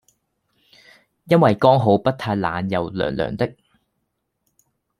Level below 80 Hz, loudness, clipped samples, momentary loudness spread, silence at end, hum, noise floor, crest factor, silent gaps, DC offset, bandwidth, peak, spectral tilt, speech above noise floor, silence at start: -54 dBFS; -19 LUFS; under 0.1%; 10 LU; 1.5 s; none; -74 dBFS; 20 dB; none; under 0.1%; 13 kHz; 0 dBFS; -8 dB/octave; 56 dB; 1.25 s